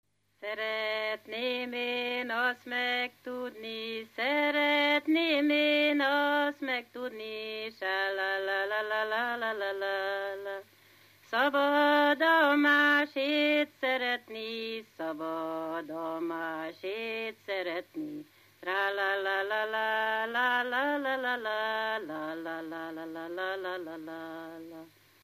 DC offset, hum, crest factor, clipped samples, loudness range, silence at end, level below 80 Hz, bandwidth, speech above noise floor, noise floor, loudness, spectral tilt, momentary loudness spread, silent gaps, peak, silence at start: under 0.1%; 50 Hz at -80 dBFS; 18 dB; under 0.1%; 10 LU; 0.35 s; -86 dBFS; 15 kHz; 30 dB; -60 dBFS; -30 LUFS; -3.5 dB/octave; 15 LU; none; -14 dBFS; 0.4 s